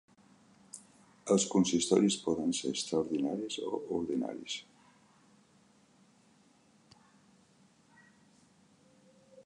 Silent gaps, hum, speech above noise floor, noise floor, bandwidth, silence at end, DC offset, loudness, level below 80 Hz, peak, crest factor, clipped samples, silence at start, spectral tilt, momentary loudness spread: none; none; 34 dB; -66 dBFS; 11.5 kHz; 0.05 s; under 0.1%; -32 LUFS; -72 dBFS; -14 dBFS; 22 dB; under 0.1%; 0.75 s; -4.5 dB/octave; 20 LU